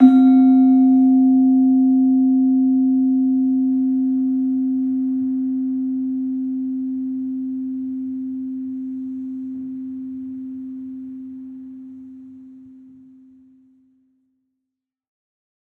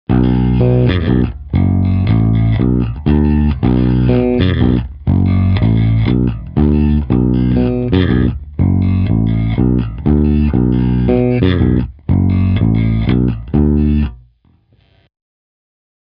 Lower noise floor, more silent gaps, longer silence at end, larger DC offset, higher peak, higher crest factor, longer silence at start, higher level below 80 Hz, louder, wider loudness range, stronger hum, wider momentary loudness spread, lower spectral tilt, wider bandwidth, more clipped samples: first, -82 dBFS vs -52 dBFS; neither; first, 2.95 s vs 1.9 s; neither; about the same, -2 dBFS vs 0 dBFS; first, 18 dB vs 12 dB; about the same, 0 s vs 0.1 s; second, -70 dBFS vs -22 dBFS; second, -18 LUFS vs -14 LUFS; first, 20 LU vs 2 LU; neither; first, 20 LU vs 4 LU; second, -9.5 dB/octave vs -12 dB/octave; second, 4.1 kHz vs 5.2 kHz; neither